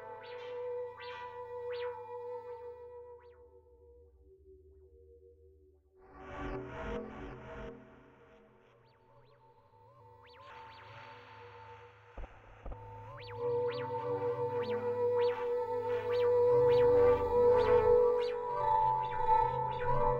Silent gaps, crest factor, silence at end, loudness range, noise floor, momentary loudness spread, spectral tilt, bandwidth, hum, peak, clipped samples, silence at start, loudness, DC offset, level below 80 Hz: none; 18 dB; 0 s; 25 LU; -64 dBFS; 25 LU; -7.5 dB/octave; 5.2 kHz; none; -16 dBFS; under 0.1%; 0 s; -32 LUFS; under 0.1%; -52 dBFS